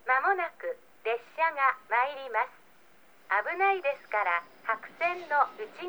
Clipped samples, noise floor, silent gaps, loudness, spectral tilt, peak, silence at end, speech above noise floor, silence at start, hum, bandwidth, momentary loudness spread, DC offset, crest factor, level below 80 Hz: under 0.1%; -60 dBFS; none; -29 LUFS; -3 dB/octave; -10 dBFS; 0 s; 30 dB; 0.05 s; none; over 20 kHz; 8 LU; 0.1%; 20 dB; -82 dBFS